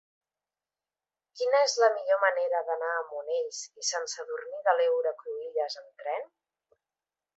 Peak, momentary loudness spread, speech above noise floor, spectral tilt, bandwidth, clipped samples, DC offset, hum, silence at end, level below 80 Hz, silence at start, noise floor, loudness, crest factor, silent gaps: -8 dBFS; 12 LU; over 61 dB; 2.5 dB/octave; 8.2 kHz; under 0.1%; under 0.1%; none; 1.1 s; -90 dBFS; 1.35 s; under -90 dBFS; -29 LUFS; 22 dB; none